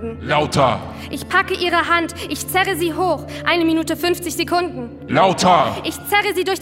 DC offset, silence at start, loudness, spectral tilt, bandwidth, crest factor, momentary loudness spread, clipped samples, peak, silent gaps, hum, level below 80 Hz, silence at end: under 0.1%; 0 s; -18 LUFS; -4 dB/octave; 16 kHz; 18 dB; 10 LU; under 0.1%; -2 dBFS; none; none; -48 dBFS; 0 s